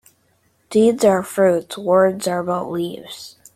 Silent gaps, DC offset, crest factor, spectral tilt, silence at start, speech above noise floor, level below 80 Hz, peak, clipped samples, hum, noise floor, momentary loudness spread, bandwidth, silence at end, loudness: none; under 0.1%; 18 dB; -5.5 dB/octave; 0.7 s; 44 dB; -60 dBFS; -2 dBFS; under 0.1%; none; -62 dBFS; 14 LU; 15.5 kHz; 0.25 s; -18 LUFS